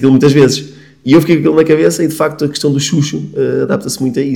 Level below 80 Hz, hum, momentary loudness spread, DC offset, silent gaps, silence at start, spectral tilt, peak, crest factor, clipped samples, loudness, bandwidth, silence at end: -50 dBFS; none; 8 LU; 0.3%; none; 0 s; -5.5 dB/octave; 0 dBFS; 12 dB; 2%; -12 LUFS; 17.5 kHz; 0 s